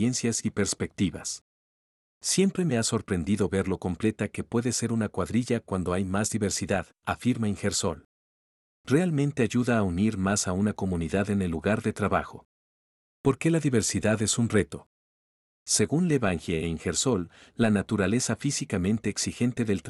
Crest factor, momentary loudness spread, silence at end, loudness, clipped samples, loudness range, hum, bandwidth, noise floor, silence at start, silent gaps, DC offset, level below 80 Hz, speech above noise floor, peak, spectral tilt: 18 dB; 6 LU; 0 s; -27 LUFS; under 0.1%; 2 LU; none; 13.5 kHz; under -90 dBFS; 0 s; 1.41-2.21 s, 8.05-8.84 s, 12.45-13.24 s, 14.86-15.66 s; under 0.1%; -56 dBFS; over 63 dB; -10 dBFS; -5 dB/octave